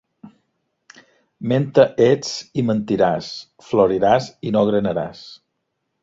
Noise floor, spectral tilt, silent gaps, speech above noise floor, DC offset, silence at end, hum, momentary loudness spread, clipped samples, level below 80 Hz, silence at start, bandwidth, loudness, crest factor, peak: -75 dBFS; -6.5 dB/octave; none; 56 dB; under 0.1%; 0.7 s; none; 15 LU; under 0.1%; -54 dBFS; 0.25 s; 7.8 kHz; -19 LUFS; 20 dB; 0 dBFS